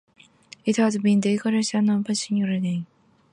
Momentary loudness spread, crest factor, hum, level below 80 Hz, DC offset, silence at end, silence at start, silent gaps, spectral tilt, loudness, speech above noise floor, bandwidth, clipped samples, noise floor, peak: 9 LU; 14 dB; none; -70 dBFS; under 0.1%; 0.5 s; 0.65 s; none; -5.5 dB/octave; -23 LUFS; 28 dB; 11 kHz; under 0.1%; -50 dBFS; -10 dBFS